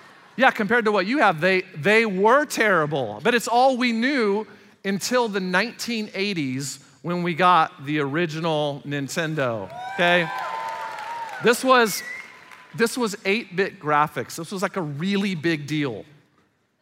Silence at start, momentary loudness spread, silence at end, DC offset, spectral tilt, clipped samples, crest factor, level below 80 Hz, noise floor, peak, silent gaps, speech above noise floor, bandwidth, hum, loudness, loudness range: 0.35 s; 13 LU; 0.8 s; under 0.1%; -4.5 dB/octave; under 0.1%; 20 dB; -74 dBFS; -64 dBFS; -4 dBFS; none; 42 dB; 16 kHz; none; -22 LUFS; 5 LU